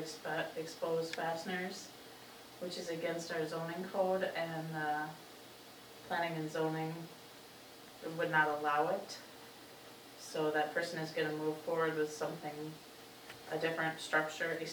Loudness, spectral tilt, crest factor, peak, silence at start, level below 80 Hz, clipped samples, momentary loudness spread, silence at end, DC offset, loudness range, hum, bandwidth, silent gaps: -38 LUFS; -4.5 dB/octave; 20 dB; -18 dBFS; 0 s; -80 dBFS; under 0.1%; 19 LU; 0 s; under 0.1%; 4 LU; none; over 20 kHz; none